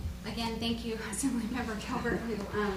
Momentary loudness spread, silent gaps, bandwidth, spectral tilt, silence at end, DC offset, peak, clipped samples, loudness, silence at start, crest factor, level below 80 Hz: 3 LU; none; 15.5 kHz; -4.5 dB/octave; 0 s; under 0.1%; -20 dBFS; under 0.1%; -34 LUFS; 0 s; 14 dB; -46 dBFS